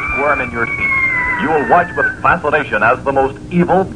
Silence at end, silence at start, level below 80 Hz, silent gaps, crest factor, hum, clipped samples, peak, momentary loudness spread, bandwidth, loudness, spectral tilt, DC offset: 0 s; 0 s; -36 dBFS; none; 14 dB; none; under 0.1%; 0 dBFS; 4 LU; 10.5 kHz; -14 LUFS; -7 dB/octave; 0.5%